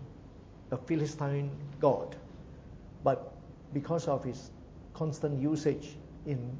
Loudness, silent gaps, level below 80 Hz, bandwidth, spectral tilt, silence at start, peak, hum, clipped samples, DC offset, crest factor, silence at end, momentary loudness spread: -34 LUFS; none; -56 dBFS; 8 kHz; -7.5 dB/octave; 0 s; -14 dBFS; none; under 0.1%; under 0.1%; 20 dB; 0 s; 20 LU